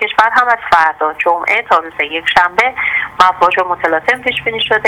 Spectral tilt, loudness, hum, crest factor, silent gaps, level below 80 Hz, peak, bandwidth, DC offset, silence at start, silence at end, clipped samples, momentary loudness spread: -3 dB/octave; -12 LUFS; none; 12 dB; none; -46 dBFS; 0 dBFS; 17 kHz; under 0.1%; 0 s; 0 s; 0.2%; 5 LU